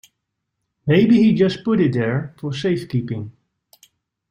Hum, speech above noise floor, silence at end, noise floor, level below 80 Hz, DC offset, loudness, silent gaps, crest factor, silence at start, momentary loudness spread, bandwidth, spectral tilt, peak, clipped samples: none; 60 dB; 1 s; -77 dBFS; -56 dBFS; under 0.1%; -18 LUFS; none; 16 dB; 0.85 s; 15 LU; 10 kHz; -8 dB/octave; -4 dBFS; under 0.1%